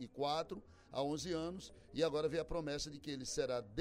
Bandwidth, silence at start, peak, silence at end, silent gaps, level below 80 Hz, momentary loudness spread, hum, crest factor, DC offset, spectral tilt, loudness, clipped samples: 15.5 kHz; 0 s; -24 dBFS; 0 s; none; -60 dBFS; 10 LU; none; 18 dB; under 0.1%; -4.5 dB/octave; -41 LUFS; under 0.1%